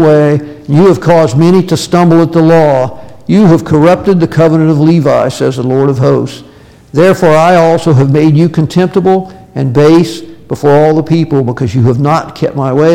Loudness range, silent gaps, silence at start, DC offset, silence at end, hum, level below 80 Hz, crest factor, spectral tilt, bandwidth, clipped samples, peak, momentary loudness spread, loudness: 2 LU; none; 0 s; under 0.1%; 0 s; none; -40 dBFS; 8 dB; -7.5 dB/octave; 15 kHz; under 0.1%; 0 dBFS; 7 LU; -8 LUFS